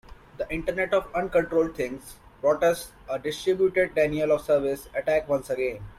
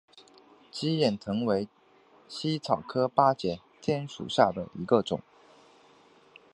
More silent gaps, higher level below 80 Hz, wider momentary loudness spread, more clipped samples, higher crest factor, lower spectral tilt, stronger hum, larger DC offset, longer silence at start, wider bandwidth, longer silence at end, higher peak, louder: neither; first, -50 dBFS vs -64 dBFS; about the same, 10 LU vs 11 LU; neither; second, 16 dB vs 24 dB; about the same, -5.5 dB/octave vs -6 dB/octave; neither; neither; second, 0.1 s vs 0.75 s; first, 15.5 kHz vs 11.5 kHz; second, 0.05 s vs 1.35 s; second, -10 dBFS vs -6 dBFS; first, -26 LUFS vs -29 LUFS